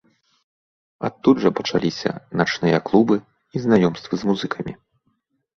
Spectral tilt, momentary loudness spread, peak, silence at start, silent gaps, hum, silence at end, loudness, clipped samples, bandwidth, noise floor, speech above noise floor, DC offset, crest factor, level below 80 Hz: -6.5 dB/octave; 12 LU; -2 dBFS; 1 s; none; none; 0.85 s; -21 LUFS; under 0.1%; 7.2 kHz; -69 dBFS; 50 dB; under 0.1%; 20 dB; -56 dBFS